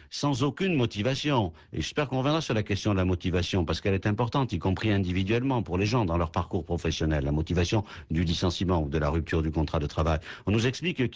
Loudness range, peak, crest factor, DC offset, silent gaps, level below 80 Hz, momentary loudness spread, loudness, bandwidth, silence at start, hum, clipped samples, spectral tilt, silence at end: 1 LU; -14 dBFS; 14 dB; under 0.1%; none; -38 dBFS; 4 LU; -28 LUFS; 8 kHz; 0.1 s; none; under 0.1%; -6 dB/octave; 0 s